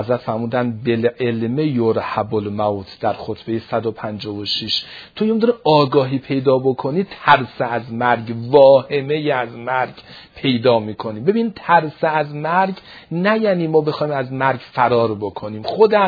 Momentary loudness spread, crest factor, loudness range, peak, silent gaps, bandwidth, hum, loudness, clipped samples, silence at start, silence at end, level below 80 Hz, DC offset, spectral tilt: 10 LU; 18 dB; 5 LU; 0 dBFS; none; 5 kHz; none; -18 LUFS; under 0.1%; 0 s; 0 s; -56 dBFS; under 0.1%; -7.5 dB/octave